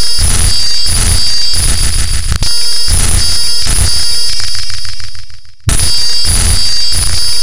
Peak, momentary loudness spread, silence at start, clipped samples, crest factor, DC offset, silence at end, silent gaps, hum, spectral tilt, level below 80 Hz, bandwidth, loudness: 0 dBFS; 6 LU; 0 s; 1%; 10 dB; 30%; 0 s; none; none; -1.5 dB/octave; -16 dBFS; 16.5 kHz; -11 LUFS